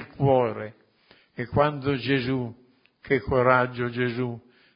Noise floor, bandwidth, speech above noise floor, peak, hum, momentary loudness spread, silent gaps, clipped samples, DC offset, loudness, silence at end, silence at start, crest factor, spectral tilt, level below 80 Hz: -59 dBFS; 5.4 kHz; 35 dB; -4 dBFS; none; 16 LU; none; under 0.1%; under 0.1%; -25 LUFS; 0.35 s; 0 s; 22 dB; -11 dB/octave; -50 dBFS